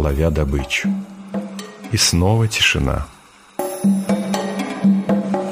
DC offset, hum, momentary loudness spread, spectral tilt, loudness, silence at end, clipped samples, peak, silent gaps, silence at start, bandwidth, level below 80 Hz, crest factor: under 0.1%; none; 14 LU; -4.5 dB/octave; -19 LUFS; 0 s; under 0.1%; -2 dBFS; none; 0 s; 15.5 kHz; -30 dBFS; 16 dB